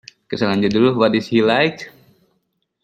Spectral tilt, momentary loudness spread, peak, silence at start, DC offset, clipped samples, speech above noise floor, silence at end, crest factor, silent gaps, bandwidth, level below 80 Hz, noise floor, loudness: -6.5 dB/octave; 16 LU; -2 dBFS; 0.3 s; under 0.1%; under 0.1%; 53 dB; 0.95 s; 18 dB; none; 9 kHz; -56 dBFS; -70 dBFS; -17 LUFS